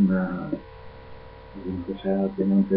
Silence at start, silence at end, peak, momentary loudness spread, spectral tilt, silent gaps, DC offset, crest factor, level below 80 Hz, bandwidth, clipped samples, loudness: 0 s; 0 s; -10 dBFS; 23 LU; -12.5 dB/octave; none; under 0.1%; 14 dB; -50 dBFS; 4.7 kHz; under 0.1%; -27 LUFS